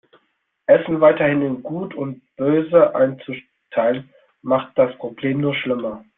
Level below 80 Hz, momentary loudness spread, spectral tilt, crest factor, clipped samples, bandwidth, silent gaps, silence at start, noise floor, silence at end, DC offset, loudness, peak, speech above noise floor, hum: -60 dBFS; 15 LU; -11 dB/octave; 18 dB; under 0.1%; 3.9 kHz; none; 0.7 s; -68 dBFS; 0.2 s; under 0.1%; -19 LUFS; -2 dBFS; 49 dB; none